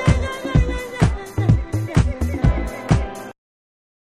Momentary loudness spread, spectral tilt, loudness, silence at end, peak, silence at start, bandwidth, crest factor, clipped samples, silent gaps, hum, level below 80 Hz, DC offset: 6 LU; -7 dB/octave; -21 LUFS; 0.8 s; -2 dBFS; 0 s; 13.5 kHz; 18 dB; under 0.1%; none; none; -26 dBFS; under 0.1%